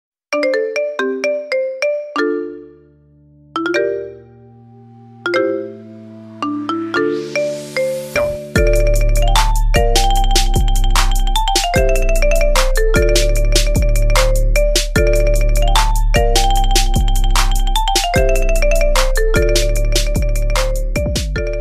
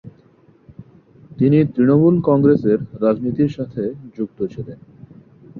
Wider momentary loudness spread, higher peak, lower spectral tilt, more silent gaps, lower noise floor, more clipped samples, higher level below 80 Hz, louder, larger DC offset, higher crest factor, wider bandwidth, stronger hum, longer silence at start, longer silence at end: second, 6 LU vs 14 LU; about the same, 0 dBFS vs -2 dBFS; second, -4 dB/octave vs -11 dB/octave; neither; second, -48 dBFS vs -52 dBFS; neither; first, -16 dBFS vs -52 dBFS; about the same, -17 LUFS vs -17 LUFS; neither; about the same, 14 dB vs 16 dB; first, 15.5 kHz vs 4.7 kHz; neither; first, 0.3 s vs 0.05 s; about the same, 0 s vs 0 s